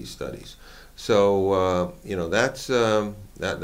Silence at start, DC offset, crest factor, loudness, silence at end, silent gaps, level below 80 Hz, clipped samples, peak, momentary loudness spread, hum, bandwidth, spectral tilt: 0 s; under 0.1%; 18 dB; -23 LUFS; 0 s; none; -48 dBFS; under 0.1%; -6 dBFS; 15 LU; none; 16 kHz; -5 dB/octave